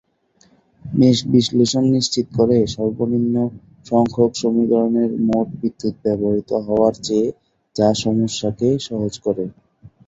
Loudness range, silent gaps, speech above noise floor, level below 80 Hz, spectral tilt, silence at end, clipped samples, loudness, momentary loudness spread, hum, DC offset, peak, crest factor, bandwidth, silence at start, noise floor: 2 LU; none; 40 dB; -50 dBFS; -6 dB/octave; 0.2 s; under 0.1%; -18 LUFS; 8 LU; none; under 0.1%; -2 dBFS; 16 dB; 8 kHz; 0.85 s; -58 dBFS